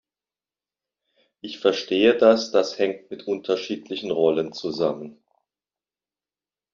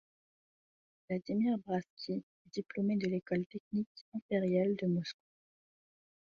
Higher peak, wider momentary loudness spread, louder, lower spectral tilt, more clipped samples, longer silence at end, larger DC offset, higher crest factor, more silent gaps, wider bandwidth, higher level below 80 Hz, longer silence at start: first, -2 dBFS vs -20 dBFS; first, 17 LU vs 12 LU; first, -22 LUFS vs -36 LUFS; second, -3 dB/octave vs -7 dB/octave; neither; first, 1.6 s vs 1.25 s; neither; first, 22 dB vs 16 dB; second, none vs 1.90-1.97 s, 2.23-2.45 s, 3.46-3.50 s, 3.60-3.71 s, 3.86-3.95 s, 4.01-4.12 s, 4.22-4.29 s; about the same, 7.4 kHz vs 7.2 kHz; first, -70 dBFS vs -76 dBFS; first, 1.45 s vs 1.1 s